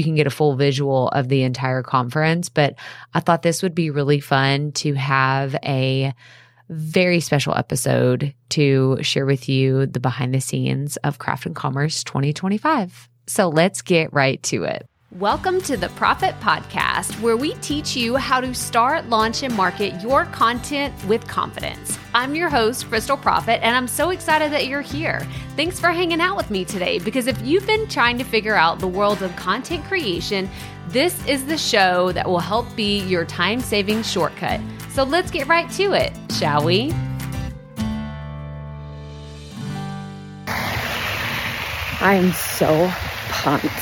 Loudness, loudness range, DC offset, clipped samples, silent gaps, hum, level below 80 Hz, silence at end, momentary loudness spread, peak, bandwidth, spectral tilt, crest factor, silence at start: -20 LUFS; 3 LU; under 0.1%; under 0.1%; none; none; -44 dBFS; 0 s; 10 LU; -2 dBFS; 18 kHz; -4.5 dB/octave; 18 dB; 0 s